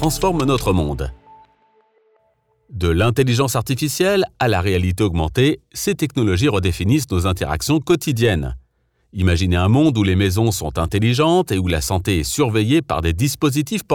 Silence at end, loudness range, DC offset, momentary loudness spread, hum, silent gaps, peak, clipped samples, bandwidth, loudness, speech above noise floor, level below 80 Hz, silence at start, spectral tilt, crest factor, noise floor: 0 s; 4 LU; under 0.1%; 6 LU; none; none; -4 dBFS; under 0.1%; 18.5 kHz; -18 LUFS; 45 dB; -36 dBFS; 0 s; -5.5 dB/octave; 14 dB; -63 dBFS